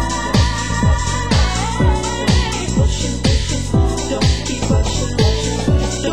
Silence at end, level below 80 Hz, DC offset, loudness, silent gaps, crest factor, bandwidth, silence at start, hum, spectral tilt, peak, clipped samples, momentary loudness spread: 0 s; -20 dBFS; 2%; -17 LUFS; none; 14 dB; 13 kHz; 0 s; none; -5 dB/octave; -2 dBFS; under 0.1%; 2 LU